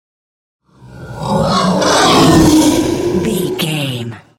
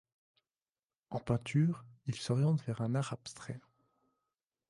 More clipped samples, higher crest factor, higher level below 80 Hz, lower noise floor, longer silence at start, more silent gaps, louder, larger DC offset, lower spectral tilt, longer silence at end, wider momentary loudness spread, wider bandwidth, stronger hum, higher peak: neither; second, 14 dB vs 20 dB; first, -34 dBFS vs -68 dBFS; second, -34 dBFS vs under -90 dBFS; second, 0.85 s vs 1.1 s; neither; first, -12 LUFS vs -35 LUFS; neither; second, -4.5 dB/octave vs -7 dB/octave; second, 0.2 s vs 1.1 s; about the same, 12 LU vs 14 LU; first, 17 kHz vs 11.5 kHz; neither; first, 0 dBFS vs -18 dBFS